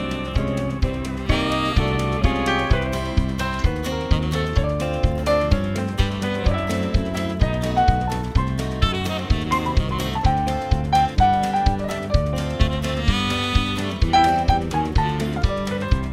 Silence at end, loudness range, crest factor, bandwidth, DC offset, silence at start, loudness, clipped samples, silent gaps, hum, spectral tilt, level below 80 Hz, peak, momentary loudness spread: 0 s; 2 LU; 18 dB; 15 kHz; under 0.1%; 0 s; -22 LUFS; under 0.1%; none; none; -6 dB/octave; -26 dBFS; -2 dBFS; 5 LU